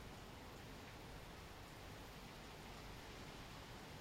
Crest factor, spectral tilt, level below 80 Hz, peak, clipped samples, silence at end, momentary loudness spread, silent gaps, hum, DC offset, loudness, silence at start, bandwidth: 12 dB; -4 dB/octave; -62 dBFS; -42 dBFS; under 0.1%; 0 s; 2 LU; none; none; under 0.1%; -55 LUFS; 0 s; 16 kHz